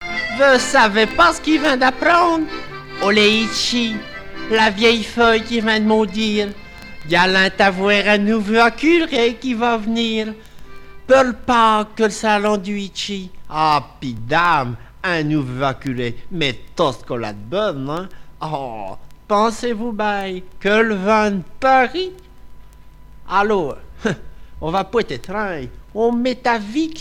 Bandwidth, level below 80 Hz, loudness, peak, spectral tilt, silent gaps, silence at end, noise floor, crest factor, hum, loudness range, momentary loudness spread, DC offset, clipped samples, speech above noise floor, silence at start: 15 kHz; -42 dBFS; -17 LUFS; -2 dBFS; -4.5 dB/octave; none; 0 s; -40 dBFS; 16 dB; none; 7 LU; 14 LU; under 0.1%; under 0.1%; 23 dB; 0 s